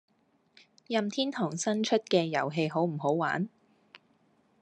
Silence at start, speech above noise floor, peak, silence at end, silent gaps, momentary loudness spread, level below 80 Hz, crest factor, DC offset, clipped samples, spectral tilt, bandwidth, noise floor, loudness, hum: 0.9 s; 39 dB; -12 dBFS; 0.65 s; none; 5 LU; -80 dBFS; 20 dB; under 0.1%; under 0.1%; -5 dB/octave; 11 kHz; -68 dBFS; -30 LUFS; none